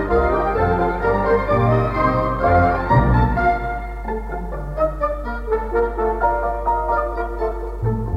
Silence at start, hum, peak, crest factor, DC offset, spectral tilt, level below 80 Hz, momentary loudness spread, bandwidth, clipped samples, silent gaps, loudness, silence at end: 0 s; none; -4 dBFS; 16 dB; under 0.1%; -9 dB/octave; -26 dBFS; 11 LU; 5.6 kHz; under 0.1%; none; -20 LUFS; 0 s